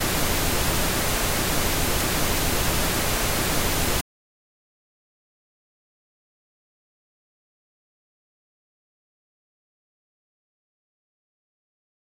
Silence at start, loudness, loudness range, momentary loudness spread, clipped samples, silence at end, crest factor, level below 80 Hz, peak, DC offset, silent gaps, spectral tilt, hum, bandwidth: 0 s; -23 LUFS; 8 LU; 0 LU; under 0.1%; 8 s; 18 dB; -34 dBFS; -10 dBFS; 1%; none; -3 dB/octave; none; 16 kHz